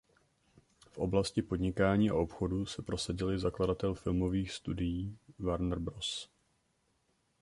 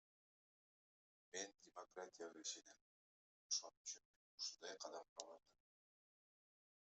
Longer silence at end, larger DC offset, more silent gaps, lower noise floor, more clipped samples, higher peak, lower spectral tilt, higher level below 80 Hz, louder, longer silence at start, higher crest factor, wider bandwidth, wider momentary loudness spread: second, 1.15 s vs 1.6 s; neither; second, none vs 2.81-3.50 s, 3.77-3.84 s, 4.05-4.38 s, 5.09-5.16 s; second, -76 dBFS vs under -90 dBFS; neither; first, -16 dBFS vs -28 dBFS; first, -6 dB/octave vs 1 dB/octave; first, -50 dBFS vs under -90 dBFS; first, -34 LUFS vs -52 LUFS; second, 0.95 s vs 1.35 s; second, 20 dB vs 30 dB; first, 11.5 kHz vs 8.2 kHz; second, 10 LU vs 15 LU